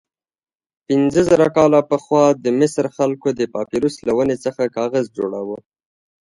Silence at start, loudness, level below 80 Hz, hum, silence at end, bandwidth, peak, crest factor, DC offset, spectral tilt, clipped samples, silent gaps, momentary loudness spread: 0.9 s; -18 LUFS; -54 dBFS; none; 0.75 s; 11.5 kHz; 0 dBFS; 18 dB; under 0.1%; -6.5 dB/octave; under 0.1%; none; 10 LU